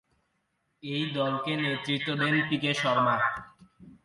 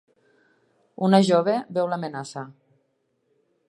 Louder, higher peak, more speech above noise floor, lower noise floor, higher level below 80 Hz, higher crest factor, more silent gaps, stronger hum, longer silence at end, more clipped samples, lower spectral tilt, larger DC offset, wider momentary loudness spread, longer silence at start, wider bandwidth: second, -27 LUFS vs -22 LUFS; second, -12 dBFS vs -2 dBFS; about the same, 48 dB vs 50 dB; first, -76 dBFS vs -71 dBFS; first, -68 dBFS vs -78 dBFS; second, 16 dB vs 22 dB; neither; neither; second, 0.1 s vs 1.15 s; neither; about the same, -5.5 dB/octave vs -6.5 dB/octave; neither; second, 8 LU vs 19 LU; second, 0.85 s vs 1 s; about the same, 11.5 kHz vs 11.5 kHz